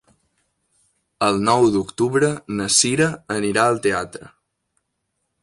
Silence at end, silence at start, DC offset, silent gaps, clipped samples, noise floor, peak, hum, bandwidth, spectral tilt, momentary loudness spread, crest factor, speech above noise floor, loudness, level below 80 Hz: 1.15 s; 1.2 s; under 0.1%; none; under 0.1%; -75 dBFS; -2 dBFS; none; 11.5 kHz; -3.5 dB/octave; 9 LU; 20 dB; 56 dB; -19 LUFS; -54 dBFS